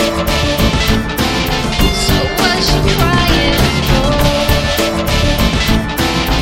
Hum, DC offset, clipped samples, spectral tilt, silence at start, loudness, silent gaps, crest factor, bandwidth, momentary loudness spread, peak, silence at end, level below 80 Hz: none; under 0.1%; under 0.1%; -4.5 dB/octave; 0 s; -13 LUFS; none; 12 dB; 17 kHz; 3 LU; 0 dBFS; 0 s; -18 dBFS